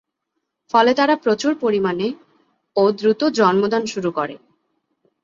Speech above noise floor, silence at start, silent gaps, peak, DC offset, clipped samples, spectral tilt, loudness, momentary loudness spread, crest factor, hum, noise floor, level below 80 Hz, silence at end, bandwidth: 59 dB; 0.75 s; none; -2 dBFS; under 0.1%; under 0.1%; -5 dB/octave; -19 LUFS; 10 LU; 18 dB; none; -77 dBFS; -64 dBFS; 0.85 s; 7.8 kHz